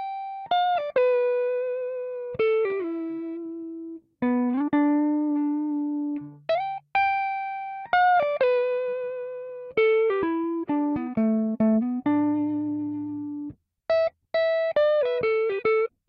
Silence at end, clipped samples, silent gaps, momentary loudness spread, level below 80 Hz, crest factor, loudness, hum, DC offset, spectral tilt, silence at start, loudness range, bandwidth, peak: 0.2 s; under 0.1%; none; 12 LU; -66 dBFS; 16 dB; -25 LUFS; none; under 0.1%; -8.5 dB/octave; 0 s; 2 LU; 5.6 kHz; -10 dBFS